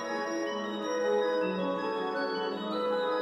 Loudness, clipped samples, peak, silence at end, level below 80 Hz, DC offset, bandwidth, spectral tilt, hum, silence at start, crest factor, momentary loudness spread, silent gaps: -31 LUFS; under 0.1%; -18 dBFS; 0 s; -80 dBFS; under 0.1%; 12 kHz; -5 dB/octave; none; 0 s; 12 dB; 5 LU; none